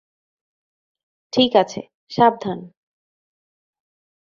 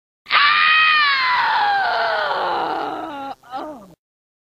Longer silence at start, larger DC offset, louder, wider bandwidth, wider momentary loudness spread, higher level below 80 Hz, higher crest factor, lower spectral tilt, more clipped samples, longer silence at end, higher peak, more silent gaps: first, 1.35 s vs 0.25 s; neither; second, -19 LUFS vs -16 LUFS; second, 7.4 kHz vs 15 kHz; second, 15 LU vs 19 LU; about the same, -64 dBFS vs -62 dBFS; about the same, 22 dB vs 18 dB; first, -5 dB/octave vs -2.5 dB/octave; neither; first, 1.55 s vs 0.55 s; about the same, -2 dBFS vs 0 dBFS; first, 1.94-2.07 s vs none